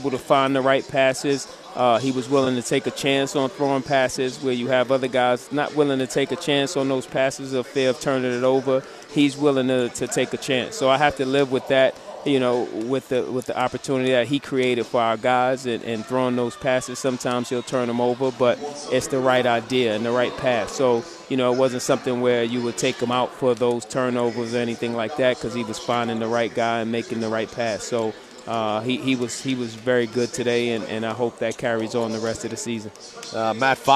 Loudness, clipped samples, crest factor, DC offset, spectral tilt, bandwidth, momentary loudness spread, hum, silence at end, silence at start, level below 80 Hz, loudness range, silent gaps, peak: -22 LUFS; under 0.1%; 20 dB; under 0.1%; -4.5 dB/octave; 14.5 kHz; 6 LU; none; 0 s; 0 s; -60 dBFS; 3 LU; none; -2 dBFS